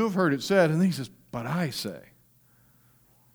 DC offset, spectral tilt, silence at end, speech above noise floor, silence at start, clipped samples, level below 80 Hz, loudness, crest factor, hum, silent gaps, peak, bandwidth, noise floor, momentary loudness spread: under 0.1%; -6 dB/octave; 1.35 s; 36 dB; 0 s; under 0.1%; -66 dBFS; -27 LUFS; 18 dB; none; none; -10 dBFS; over 20 kHz; -61 dBFS; 15 LU